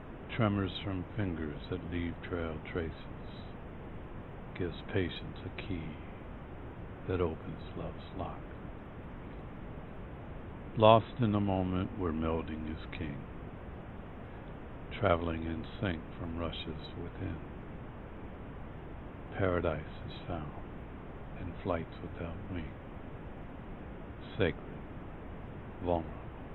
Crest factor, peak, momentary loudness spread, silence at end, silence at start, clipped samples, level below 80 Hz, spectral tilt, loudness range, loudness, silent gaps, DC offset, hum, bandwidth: 30 dB; -6 dBFS; 15 LU; 0 s; 0 s; under 0.1%; -48 dBFS; -9.5 dB/octave; 11 LU; -37 LUFS; none; under 0.1%; none; 4.3 kHz